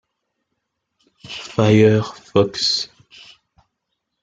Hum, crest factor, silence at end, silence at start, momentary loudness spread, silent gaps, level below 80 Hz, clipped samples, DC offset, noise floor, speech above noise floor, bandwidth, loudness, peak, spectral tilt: none; 20 dB; 1.35 s; 1.25 s; 18 LU; none; -56 dBFS; under 0.1%; under 0.1%; -76 dBFS; 61 dB; 9 kHz; -17 LUFS; 0 dBFS; -5.5 dB/octave